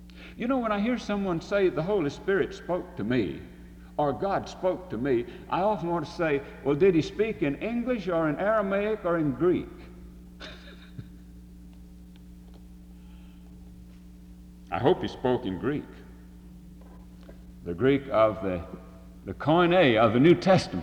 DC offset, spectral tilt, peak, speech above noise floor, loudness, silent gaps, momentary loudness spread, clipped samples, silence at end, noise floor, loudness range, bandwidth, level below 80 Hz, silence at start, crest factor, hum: under 0.1%; -7 dB/octave; -8 dBFS; 22 dB; -26 LUFS; none; 22 LU; under 0.1%; 0 s; -47 dBFS; 21 LU; 10.5 kHz; -50 dBFS; 0 s; 20 dB; none